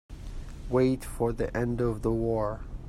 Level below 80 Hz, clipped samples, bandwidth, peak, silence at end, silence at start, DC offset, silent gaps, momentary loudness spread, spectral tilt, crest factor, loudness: -40 dBFS; under 0.1%; 14.5 kHz; -12 dBFS; 0 s; 0.1 s; under 0.1%; none; 18 LU; -7.5 dB/octave; 16 dB; -29 LUFS